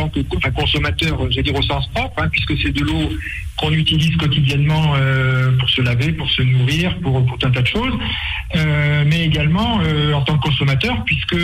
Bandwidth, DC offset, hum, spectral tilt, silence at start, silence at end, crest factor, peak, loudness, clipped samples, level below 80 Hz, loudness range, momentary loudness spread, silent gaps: 12.5 kHz; under 0.1%; none; -6 dB/octave; 0 s; 0 s; 12 dB; -4 dBFS; -17 LUFS; under 0.1%; -30 dBFS; 2 LU; 5 LU; none